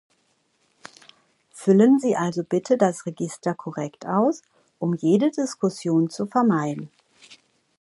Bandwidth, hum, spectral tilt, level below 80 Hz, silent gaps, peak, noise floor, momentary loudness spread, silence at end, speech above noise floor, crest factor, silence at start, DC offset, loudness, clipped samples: 11.5 kHz; none; -7 dB/octave; -72 dBFS; none; -4 dBFS; -68 dBFS; 13 LU; 0.45 s; 46 dB; 20 dB; 1.55 s; under 0.1%; -22 LUFS; under 0.1%